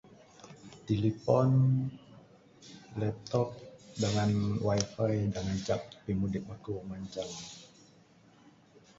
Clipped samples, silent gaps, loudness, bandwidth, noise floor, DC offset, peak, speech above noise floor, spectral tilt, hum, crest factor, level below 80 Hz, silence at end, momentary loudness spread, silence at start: under 0.1%; none; -32 LUFS; 8 kHz; -61 dBFS; under 0.1%; -12 dBFS; 30 dB; -6.5 dB/octave; none; 20 dB; -56 dBFS; 1.35 s; 22 LU; 0.45 s